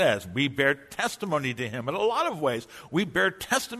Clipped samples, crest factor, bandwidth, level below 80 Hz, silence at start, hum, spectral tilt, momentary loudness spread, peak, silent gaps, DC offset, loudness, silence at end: under 0.1%; 18 dB; 13.5 kHz; -60 dBFS; 0 s; none; -4 dB/octave; 6 LU; -10 dBFS; none; under 0.1%; -27 LUFS; 0 s